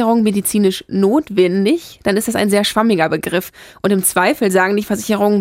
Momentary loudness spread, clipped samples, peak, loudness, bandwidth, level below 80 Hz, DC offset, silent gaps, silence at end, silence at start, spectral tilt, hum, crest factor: 5 LU; under 0.1%; -2 dBFS; -15 LUFS; 16 kHz; -52 dBFS; under 0.1%; none; 0 s; 0 s; -4.5 dB/octave; none; 14 dB